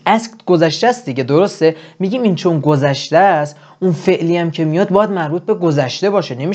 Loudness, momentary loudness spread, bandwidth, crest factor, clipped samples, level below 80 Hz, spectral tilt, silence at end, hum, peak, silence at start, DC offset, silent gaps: -15 LUFS; 6 LU; 8.8 kHz; 14 dB; under 0.1%; -62 dBFS; -6.5 dB/octave; 0 s; none; 0 dBFS; 0.05 s; under 0.1%; none